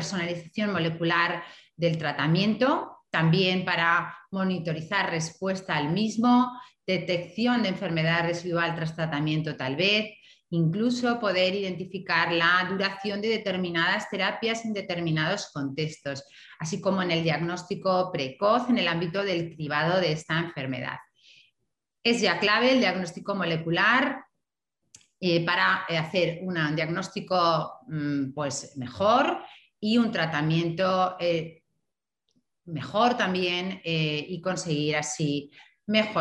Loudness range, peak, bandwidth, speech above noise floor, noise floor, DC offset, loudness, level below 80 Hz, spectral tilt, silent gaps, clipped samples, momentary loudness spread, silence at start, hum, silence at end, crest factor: 3 LU; -8 dBFS; 10.5 kHz; 59 dB; -85 dBFS; under 0.1%; -26 LUFS; -68 dBFS; -5 dB/octave; none; under 0.1%; 10 LU; 0 s; none; 0 s; 18 dB